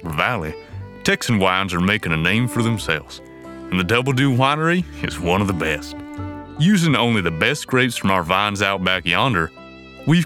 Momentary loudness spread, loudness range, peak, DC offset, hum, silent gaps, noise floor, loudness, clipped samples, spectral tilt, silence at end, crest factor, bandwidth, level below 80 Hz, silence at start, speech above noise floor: 15 LU; 2 LU; 0 dBFS; under 0.1%; none; none; -39 dBFS; -19 LUFS; under 0.1%; -5 dB/octave; 0 s; 20 dB; 17 kHz; -42 dBFS; 0 s; 20 dB